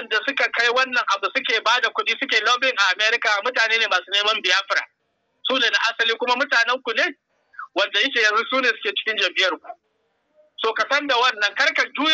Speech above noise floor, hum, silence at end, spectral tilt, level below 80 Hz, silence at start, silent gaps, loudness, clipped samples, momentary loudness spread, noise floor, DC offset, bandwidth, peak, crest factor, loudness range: 50 dB; none; 0 s; 0.5 dB/octave; -80 dBFS; 0 s; none; -19 LUFS; under 0.1%; 6 LU; -71 dBFS; under 0.1%; 8.6 kHz; -4 dBFS; 16 dB; 3 LU